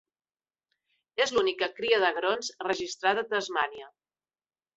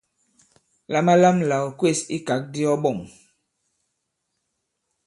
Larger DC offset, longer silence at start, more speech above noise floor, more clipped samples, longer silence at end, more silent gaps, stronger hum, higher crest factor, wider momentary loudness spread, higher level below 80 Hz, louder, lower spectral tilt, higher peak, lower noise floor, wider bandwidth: neither; first, 1.15 s vs 0.9 s; first, over 62 dB vs 57 dB; neither; second, 0.9 s vs 2 s; neither; neither; about the same, 20 dB vs 20 dB; second, 7 LU vs 10 LU; second, -70 dBFS vs -64 dBFS; second, -28 LUFS vs -21 LUFS; second, -2 dB/octave vs -5.5 dB/octave; second, -10 dBFS vs -4 dBFS; first, under -90 dBFS vs -77 dBFS; second, 8.2 kHz vs 11.5 kHz